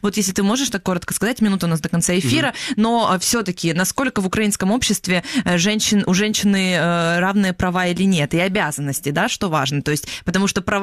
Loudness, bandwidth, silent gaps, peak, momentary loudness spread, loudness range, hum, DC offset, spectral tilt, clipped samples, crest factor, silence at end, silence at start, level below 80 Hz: -18 LUFS; 15 kHz; none; -4 dBFS; 4 LU; 1 LU; none; under 0.1%; -4 dB/octave; under 0.1%; 14 dB; 0 s; 0.05 s; -44 dBFS